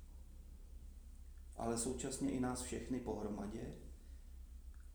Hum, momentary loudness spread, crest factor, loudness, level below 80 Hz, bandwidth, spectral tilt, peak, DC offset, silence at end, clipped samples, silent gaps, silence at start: none; 19 LU; 18 dB; -43 LUFS; -54 dBFS; over 20 kHz; -5 dB/octave; -26 dBFS; under 0.1%; 0 s; under 0.1%; none; 0 s